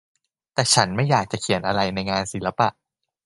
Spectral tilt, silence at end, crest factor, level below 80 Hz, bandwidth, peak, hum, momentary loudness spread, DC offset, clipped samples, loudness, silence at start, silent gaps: -3.5 dB/octave; 0.55 s; 22 dB; -52 dBFS; 11.5 kHz; 0 dBFS; none; 7 LU; under 0.1%; under 0.1%; -22 LUFS; 0.55 s; none